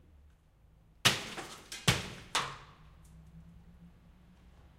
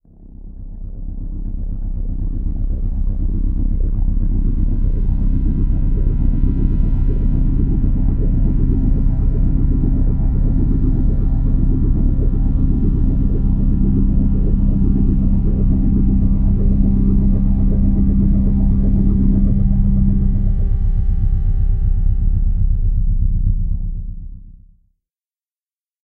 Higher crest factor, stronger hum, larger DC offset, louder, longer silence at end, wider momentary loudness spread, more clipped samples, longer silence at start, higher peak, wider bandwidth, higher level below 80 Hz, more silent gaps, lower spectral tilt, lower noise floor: first, 32 dB vs 12 dB; neither; neither; second, -33 LUFS vs -19 LUFS; second, 0.1 s vs 1.5 s; first, 27 LU vs 9 LU; neither; first, 1.05 s vs 0.2 s; second, -8 dBFS vs -2 dBFS; first, 16 kHz vs 1.4 kHz; second, -56 dBFS vs -16 dBFS; neither; second, -2.5 dB/octave vs -13.5 dB/octave; second, -63 dBFS vs under -90 dBFS